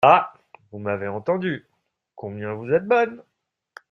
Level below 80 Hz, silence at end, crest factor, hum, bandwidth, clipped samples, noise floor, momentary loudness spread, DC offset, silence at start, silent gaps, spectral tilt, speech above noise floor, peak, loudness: -66 dBFS; 0.75 s; 22 dB; none; 6.4 kHz; under 0.1%; -50 dBFS; 17 LU; under 0.1%; 0 s; none; -7.5 dB/octave; 29 dB; -2 dBFS; -23 LUFS